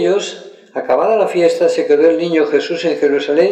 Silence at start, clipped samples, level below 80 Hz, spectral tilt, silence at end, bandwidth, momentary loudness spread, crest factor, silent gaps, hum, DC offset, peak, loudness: 0 s; under 0.1%; -64 dBFS; -5 dB/octave; 0 s; 9.6 kHz; 13 LU; 12 dB; none; none; under 0.1%; -2 dBFS; -14 LUFS